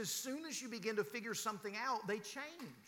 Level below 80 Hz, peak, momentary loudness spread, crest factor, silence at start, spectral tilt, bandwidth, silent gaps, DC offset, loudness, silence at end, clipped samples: under -90 dBFS; -26 dBFS; 6 LU; 18 dB; 0 s; -2.5 dB/octave; 19 kHz; none; under 0.1%; -42 LUFS; 0 s; under 0.1%